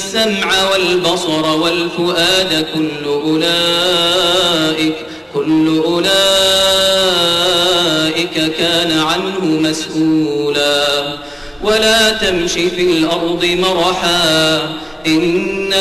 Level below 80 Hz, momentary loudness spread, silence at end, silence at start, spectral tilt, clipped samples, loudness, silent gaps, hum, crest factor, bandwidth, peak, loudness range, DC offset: -42 dBFS; 7 LU; 0 s; 0 s; -3 dB/octave; under 0.1%; -13 LUFS; none; none; 10 dB; 13.5 kHz; -4 dBFS; 3 LU; under 0.1%